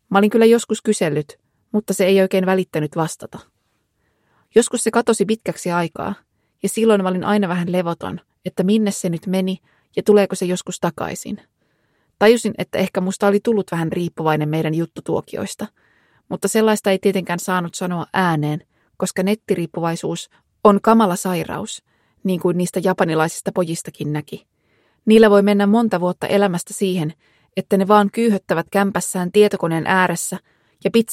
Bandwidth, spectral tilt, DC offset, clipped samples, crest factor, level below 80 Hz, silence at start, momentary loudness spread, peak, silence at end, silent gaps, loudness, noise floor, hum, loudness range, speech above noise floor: 16 kHz; -5.5 dB/octave; under 0.1%; under 0.1%; 18 dB; -60 dBFS; 0.1 s; 14 LU; 0 dBFS; 0 s; none; -19 LUFS; -68 dBFS; none; 4 LU; 50 dB